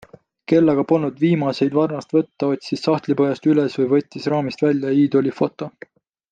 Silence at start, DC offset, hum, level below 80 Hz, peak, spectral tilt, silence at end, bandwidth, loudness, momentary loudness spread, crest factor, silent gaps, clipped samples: 0.5 s; under 0.1%; none; -62 dBFS; -4 dBFS; -8 dB/octave; 0.6 s; 7.6 kHz; -19 LUFS; 6 LU; 16 dB; none; under 0.1%